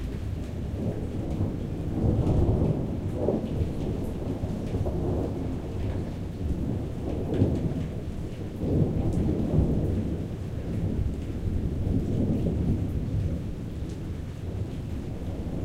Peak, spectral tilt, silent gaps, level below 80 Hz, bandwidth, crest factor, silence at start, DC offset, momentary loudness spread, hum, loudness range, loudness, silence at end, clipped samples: -10 dBFS; -9 dB/octave; none; -34 dBFS; 12.5 kHz; 18 dB; 0 s; under 0.1%; 9 LU; none; 3 LU; -30 LUFS; 0 s; under 0.1%